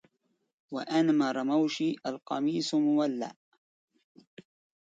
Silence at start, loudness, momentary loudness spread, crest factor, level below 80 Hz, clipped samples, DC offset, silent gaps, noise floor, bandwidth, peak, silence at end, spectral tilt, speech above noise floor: 0.7 s; -29 LUFS; 12 LU; 16 dB; -82 dBFS; under 0.1%; under 0.1%; none; -73 dBFS; 8.6 kHz; -16 dBFS; 1.55 s; -5.5 dB/octave; 44 dB